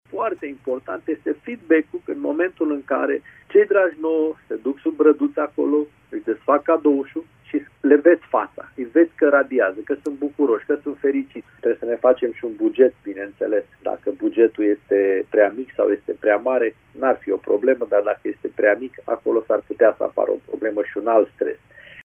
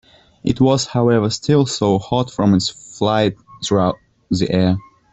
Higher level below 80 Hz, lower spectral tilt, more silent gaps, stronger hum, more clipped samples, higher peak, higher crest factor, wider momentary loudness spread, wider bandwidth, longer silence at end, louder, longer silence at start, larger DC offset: second, -64 dBFS vs -46 dBFS; first, -7.5 dB/octave vs -6 dB/octave; neither; neither; neither; about the same, -2 dBFS vs -2 dBFS; first, 20 dB vs 14 dB; about the same, 10 LU vs 8 LU; second, 3.5 kHz vs 8.2 kHz; second, 0.05 s vs 0.3 s; second, -21 LUFS vs -18 LUFS; second, 0.15 s vs 0.45 s; neither